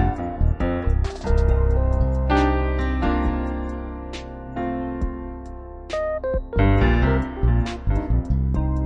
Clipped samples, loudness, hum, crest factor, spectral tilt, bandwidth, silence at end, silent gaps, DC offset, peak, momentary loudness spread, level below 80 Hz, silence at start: under 0.1%; -23 LUFS; none; 14 dB; -8 dB/octave; 7.6 kHz; 0 s; none; under 0.1%; -6 dBFS; 13 LU; -24 dBFS; 0 s